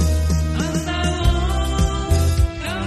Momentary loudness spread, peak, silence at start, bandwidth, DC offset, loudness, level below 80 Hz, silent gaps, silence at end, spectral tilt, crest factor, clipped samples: 3 LU; -4 dBFS; 0 s; 13.5 kHz; under 0.1%; -20 LUFS; -22 dBFS; none; 0 s; -5.5 dB/octave; 14 dB; under 0.1%